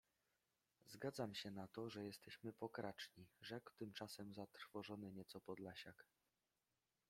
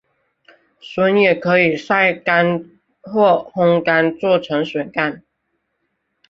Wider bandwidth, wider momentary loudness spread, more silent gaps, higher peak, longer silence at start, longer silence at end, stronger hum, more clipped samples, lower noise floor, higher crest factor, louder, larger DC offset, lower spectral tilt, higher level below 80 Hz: first, 16.5 kHz vs 7.4 kHz; about the same, 8 LU vs 8 LU; neither; second, -32 dBFS vs -2 dBFS; about the same, 0.85 s vs 0.85 s; about the same, 1.05 s vs 1.1 s; neither; neither; first, under -90 dBFS vs -71 dBFS; first, 22 dB vs 16 dB; second, -54 LUFS vs -16 LUFS; neither; second, -5 dB/octave vs -7 dB/octave; second, -88 dBFS vs -62 dBFS